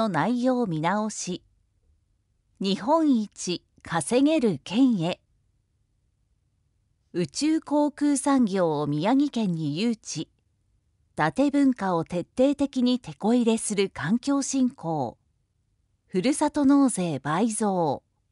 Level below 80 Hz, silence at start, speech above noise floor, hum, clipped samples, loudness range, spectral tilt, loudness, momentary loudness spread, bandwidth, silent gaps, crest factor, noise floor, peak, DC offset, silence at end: -62 dBFS; 0 s; 47 dB; none; under 0.1%; 3 LU; -5 dB/octave; -25 LUFS; 10 LU; 11.5 kHz; none; 16 dB; -71 dBFS; -10 dBFS; under 0.1%; 0.35 s